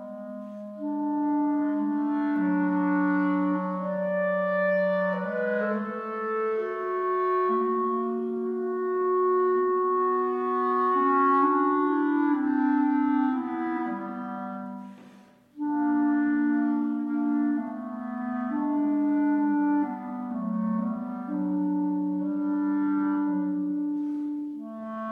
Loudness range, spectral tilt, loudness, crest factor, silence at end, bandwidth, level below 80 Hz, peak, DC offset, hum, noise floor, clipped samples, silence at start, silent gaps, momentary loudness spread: 5 LU; -9.5 dB/octave; -26 LUFS; 14 dB; 0 s; 4.2 kHz; -74 dBFS; -12 dBFS; under 0.1%; none; -53 dBFS; under 0.1%; 0 s; none; 10 LU